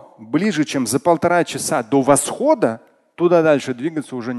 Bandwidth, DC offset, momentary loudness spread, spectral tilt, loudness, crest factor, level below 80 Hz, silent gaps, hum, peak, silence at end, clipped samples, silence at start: 12.5 kHz; under 0.1%; 9 LU; -4.5 dB/octave; -18 LUFS; 18 dB; -60 dBFS; none; none; 0 dBFS; 0 s; under 0.1%; 0.2 s